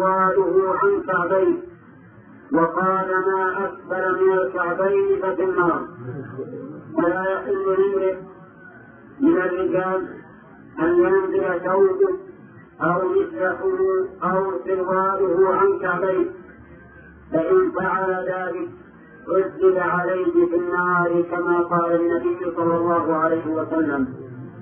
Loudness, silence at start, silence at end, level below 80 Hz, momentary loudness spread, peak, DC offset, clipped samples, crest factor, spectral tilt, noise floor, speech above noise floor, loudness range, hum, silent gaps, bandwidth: -21 LUFS; 0 s; 0 s; -58 dBFS; 10 LU; -6 dBFS; under 0.1%; under 0.1%; 16 dB; -12 dB/octave; -46 dBFS; 26 dB; 3 LU; none; none; 3.4 kHz